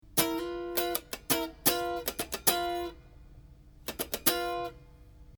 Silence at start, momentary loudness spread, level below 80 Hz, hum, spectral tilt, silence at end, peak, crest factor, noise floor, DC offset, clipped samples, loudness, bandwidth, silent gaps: 0.05 s; 11 LU; -54 dBFS; none; -2 dB/octave; 0.05 s; -6 dBFS; 28 dB; -53 dBFS; under 0.1%; under 0.1%; -30 LUFS; over 20 kHz; none